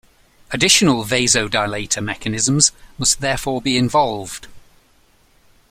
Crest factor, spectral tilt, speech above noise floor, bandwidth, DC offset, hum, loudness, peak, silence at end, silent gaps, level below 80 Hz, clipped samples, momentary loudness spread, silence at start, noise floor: 20 dB; -2.5 dB/octave; 37 dB; 16 kHz; under 0.1%; none; -16 LUFS; 0 dBFS; 1.1 s; none; -44 dBFS; under 0.1%; 10 LU; 0.5 s; -55 dBFS